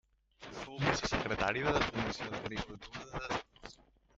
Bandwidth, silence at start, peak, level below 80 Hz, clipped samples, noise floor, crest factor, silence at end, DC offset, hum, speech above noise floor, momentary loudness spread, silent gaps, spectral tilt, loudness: 8 kHz; 0.4 s; -12 dBFS; -52 dBFS; under 0.1%; -61 dBFS; 26 dB; 0.45 s; under 0.1%; none; 25 dB; 19 LU; none; -4.5 dB/octave; -36 LUFS